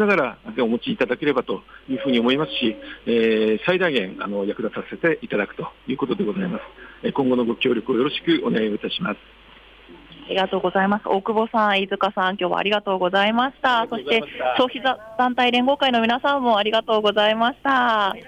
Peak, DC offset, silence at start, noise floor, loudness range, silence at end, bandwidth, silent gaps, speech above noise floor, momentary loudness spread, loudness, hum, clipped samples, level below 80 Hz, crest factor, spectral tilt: -8 dBFS; under 0.1%; 0 s; -48 dBFS; 4 LU; 0 s; 9.2 kHz; none; 27 dB; 9 LU; -21 LUFS; none; under 0.1%; -56 dBFS; 14 dB; -6 dB/octave